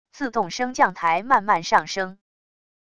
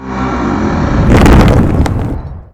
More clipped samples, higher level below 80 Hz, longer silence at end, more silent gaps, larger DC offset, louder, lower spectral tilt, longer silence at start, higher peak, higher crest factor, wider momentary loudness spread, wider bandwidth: second, under 0.1% vs 2%; second, -60 dBFS vs -14 dBFS; first, 0.75 s vs 0.1 s; neither; first, 0.5% vs under 0.1%; second, -22 LUFS vs -10 LUFS; second, -3.5 dB/octave vs -7.5 dB/octave; about the same, 0.05 s vs 0 s; second, -4 dBFS vs 0 dBFS; first, 20 dB vs 10 dB; about the same, 9 LU vs 11 LU; second, 11 kHz vs 15 kHz